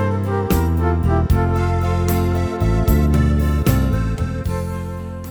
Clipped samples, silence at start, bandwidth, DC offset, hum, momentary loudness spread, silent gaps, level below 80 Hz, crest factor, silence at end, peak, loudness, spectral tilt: under 0.1%; 0 s; over 20 kHz; under 0.1%; none; 7 LU; none; -22 dBFS; 14 dB; 0 s; -2 dBFS; -19 LUFS; -7.5 dB/octave